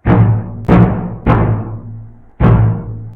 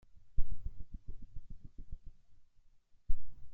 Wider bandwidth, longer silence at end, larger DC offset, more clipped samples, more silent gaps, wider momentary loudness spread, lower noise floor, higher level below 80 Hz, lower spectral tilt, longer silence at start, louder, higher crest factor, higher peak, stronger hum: first, 3.9 kHz vs 0.5 kHz; about the same, 0 s vs 0 s; neither; first, 0.3% vs under 0.1%; neither; first, 16 LU vs 11 LU; second, -32 dBFS vs -62 dBFS; first, -24 dBFS vs -42 dBFS; first, -11 dB/octave vs -9 dB/octave; second, 0.05 s vs 0.25 s; first, -13 LUFS vs -51 LUFS; second, 12 dB vs 18 dB; first, 0 dBFS vs -14 dBFS; neither